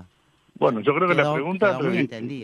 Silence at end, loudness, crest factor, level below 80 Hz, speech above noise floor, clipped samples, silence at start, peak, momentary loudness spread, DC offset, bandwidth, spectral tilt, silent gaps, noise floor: 0 s; -22 LUFS; 18 dB; -68 dBFS; 39 dB; under 0.1%; 0 s; -4 dBFS; 5 LU; under 0.1%; 10.5 kHz; -7.5 dB/octave; none; -60 dBFS